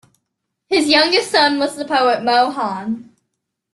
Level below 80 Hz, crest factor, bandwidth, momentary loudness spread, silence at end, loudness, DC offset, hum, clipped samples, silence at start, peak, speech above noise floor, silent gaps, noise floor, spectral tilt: -62 dBFS; 18 dB; 12.5 kHz; 11 LU; 0.7 s; -16 LUFS; under 0.1%; none; under 0.1%; 0.7 s; 0 dBFS; 60 dB; none; -76 dBFS; -2.5 dB/octave